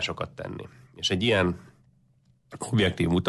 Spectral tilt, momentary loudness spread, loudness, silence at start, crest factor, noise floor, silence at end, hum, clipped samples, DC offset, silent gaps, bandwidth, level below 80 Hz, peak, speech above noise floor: -5 dB/octave; 17 LU; -26 LUFS; 0 s; 16 dB; -63 dBFS; 0 s; none; under 0.1%; under 0.1%; none; 12.5 kHz; -46 dBFS; -12 dBFS; 37 dB